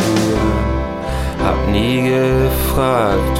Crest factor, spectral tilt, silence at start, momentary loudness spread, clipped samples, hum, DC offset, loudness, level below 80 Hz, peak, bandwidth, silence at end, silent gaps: 12 dB; -6 dB/octave; 0 s; 7 LU; under 0.1%; none; under 0.1%; -16 LUFS; -22 dBFS; -4 dBFS; 16.5 kHz; 0 s; none